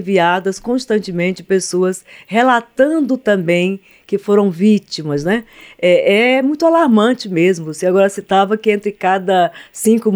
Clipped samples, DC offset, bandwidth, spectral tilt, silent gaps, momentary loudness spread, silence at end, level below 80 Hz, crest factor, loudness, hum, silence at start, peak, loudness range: under 0.1%; under 0.1%; over 20 kHz; -5.5 dB/octave; none; 8 LU; 0 s; -56 dBFS; 14 dB; -15 LUFS; none; 0 s; 0 dBFS; 2 LU